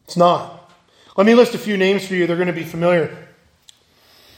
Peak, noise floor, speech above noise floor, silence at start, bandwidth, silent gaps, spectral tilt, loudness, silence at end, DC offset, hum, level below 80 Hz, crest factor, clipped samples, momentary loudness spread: 0 dBFS; -53 dBFS; 37 dB; 0.1 s; 16.5 kHz; none; -6 dB/octave; -17 LUFS; 1.15 s; under 0.1%; none; -62 dBFS; 18 dB; under 0.1%; 11 LU